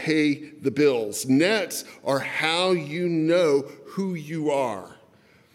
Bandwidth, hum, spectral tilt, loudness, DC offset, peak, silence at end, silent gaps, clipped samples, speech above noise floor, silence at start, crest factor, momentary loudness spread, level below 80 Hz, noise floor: 16.5 kHz; none; -4.5 dB/octave; -24 LUFS; under 0.1%; -8 dBFS; 0.6 s; none; under 0.1%; 33 dB; 0 s; 16 dB; 10 LU; -78 dBFS; -57 dBFS